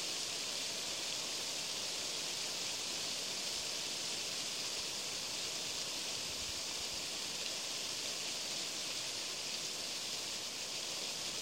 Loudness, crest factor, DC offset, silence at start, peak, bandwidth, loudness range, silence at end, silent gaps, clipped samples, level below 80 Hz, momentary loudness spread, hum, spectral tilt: -38 LUFS; 18 dB; under 0.1%; 0 s; -22 dBFS; 16 kHz; 1 LU; 0 s; none; under 0.1%; -72 dBFS; 1 LU; none; 0 dB/octave